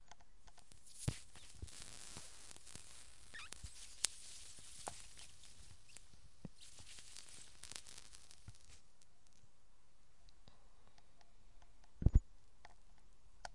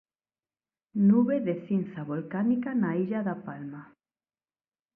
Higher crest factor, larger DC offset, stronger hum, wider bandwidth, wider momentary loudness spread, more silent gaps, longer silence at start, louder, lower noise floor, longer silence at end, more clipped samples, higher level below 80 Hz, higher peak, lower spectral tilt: first, 40 dB vs 16 dB; first, 0.2% vs under 0.1%; neither; first, 11.5 kHz vs 3.3 kHz; first, 24 LU vs 17 LU; neither; second, 0.1 s vs 0.95 s; second, -47 LUFS vs -28 LUFS; second, -73 dBFS vs under -90 dBFS; second, 0 s vs 1.1 s; neither; first, -50 dBFS vs -76 dBFS; first, -8 dBFS vs -12 dBFS; second, -3.5 dB/octave vs -12 dB/octave